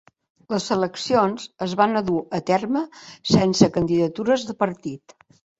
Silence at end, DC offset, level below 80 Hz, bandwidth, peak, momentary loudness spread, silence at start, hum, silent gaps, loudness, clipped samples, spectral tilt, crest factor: 0.65 s; under 0.1%; -54 dBFS; 8 kHz; 0 dBFS; 12 LU; 0.5 s; none; none; -22 LUFS; under 0.1%; -5.5 dB/octave; 22 dB